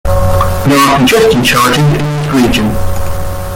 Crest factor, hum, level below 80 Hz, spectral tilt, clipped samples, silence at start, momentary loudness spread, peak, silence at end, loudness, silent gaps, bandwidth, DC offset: 8 dB; none; -22 dBFS; -5 dB/octave; under 0.1%; 0.05 s; 11 LU; 0 dBFS; 0 s; -10 LUFS; none; 17.5 kHz; under 0.1%